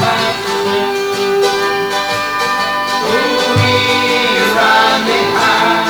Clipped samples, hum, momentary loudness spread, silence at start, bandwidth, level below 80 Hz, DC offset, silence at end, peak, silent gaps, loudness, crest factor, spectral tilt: under 0.1%; none; 5 LU; 0 s; over 20 kHz; -48 dBFS; under 0.1%; 0 s; 0 dBFS; none; -12 LUFS; 12 dB; -3.5 dB/octave